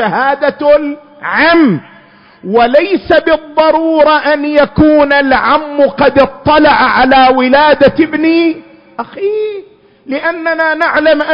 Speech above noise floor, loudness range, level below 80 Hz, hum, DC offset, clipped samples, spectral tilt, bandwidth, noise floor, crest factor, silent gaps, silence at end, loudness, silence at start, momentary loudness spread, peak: 31 dB; 4 LU; -38 dBFS; none; under 0.1%; 0.2%; -7.5 dB/octave; 5.4 kHz; -40 dBFS; 10 dB; none; 0 s; -9 LUFS; 0 s; 12 LU; 0 dBFS